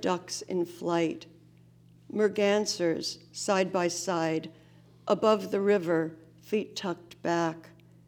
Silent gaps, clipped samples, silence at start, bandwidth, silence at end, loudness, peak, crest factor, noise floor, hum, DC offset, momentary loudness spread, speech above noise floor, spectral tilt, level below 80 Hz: none; under 0.1%; 0 s; 20 kHz; 0.4 s; -29 LUFS; -10 dBFS; 20 dB; -57 dBFS; none; under 0.1%; 10 LU; 28 dB; -4.5 dB/octave; -74 dBFS